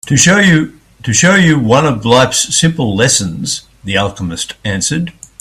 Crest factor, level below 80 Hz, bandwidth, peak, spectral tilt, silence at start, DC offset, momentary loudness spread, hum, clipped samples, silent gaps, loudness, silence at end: 12 dB; -40 dBFS; 14 kHz; 0 dBFS; -3.5 dB/octave; 0.05 s; under 0.1%; 12 LU; none; under 0.1%; none; -11 LUFS; 0.3 s